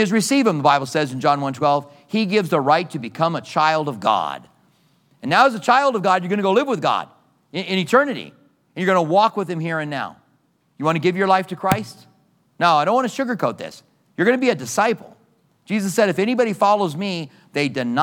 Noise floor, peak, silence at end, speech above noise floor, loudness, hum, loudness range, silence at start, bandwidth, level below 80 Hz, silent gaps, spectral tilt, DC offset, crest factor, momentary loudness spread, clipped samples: -63 dBFS; -2 dBFS; 0 s; 44 dB; -19 LUFS; none; 2 LU; 0 s; 19 kHz; -66 dBFS; none; -5 dB/octave; under 0.1%; 18 dB; 12 LU; under 0.1%